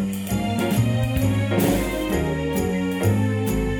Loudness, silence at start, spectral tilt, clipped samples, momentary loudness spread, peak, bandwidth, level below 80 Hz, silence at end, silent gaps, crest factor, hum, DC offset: -22 LUFS; 0 s; -6.5 dB/octave; under 0.1%; 3 LU; -8 dBFS; over 20 kHz; -34 dBFS; 0 s; none; 14 dB; none; under 0.1%